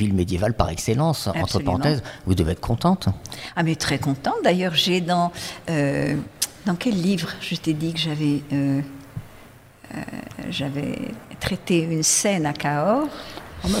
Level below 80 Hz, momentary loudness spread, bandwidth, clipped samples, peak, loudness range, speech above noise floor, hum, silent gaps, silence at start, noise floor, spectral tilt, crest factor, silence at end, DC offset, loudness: -42 dBFS; 12 LU; 16 kHz; under 0.1%; -2 dBFS; 5 LU; 24 dB; none; none; 0 s; -47 dBFS; -4.5 dB/octave; 20 dB; 0 s; under 0.1%; -23 LUFS